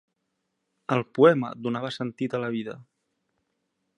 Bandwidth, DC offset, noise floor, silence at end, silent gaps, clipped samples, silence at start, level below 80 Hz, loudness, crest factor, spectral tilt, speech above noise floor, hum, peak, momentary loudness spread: 9.8 kHz; under 0.1%; -79 dBFS; 1.15 s; none; under 0.1%; 0.9 s; -74 dBFS; -25 LUFS; 22 dB; -7.5 dB/octave; 54 dB; none; -6 dBFS; 18 LU